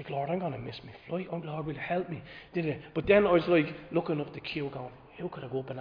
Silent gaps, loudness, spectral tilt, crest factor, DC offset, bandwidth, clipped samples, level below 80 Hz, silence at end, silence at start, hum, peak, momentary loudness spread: none; -31 LUFS; -9 dB/octave; 20 dB; under 0.1%; 5.2 kHz; under 0.1%; -58 dBFS; 0 s; 0 s; none; -10 dBFS; 17 LU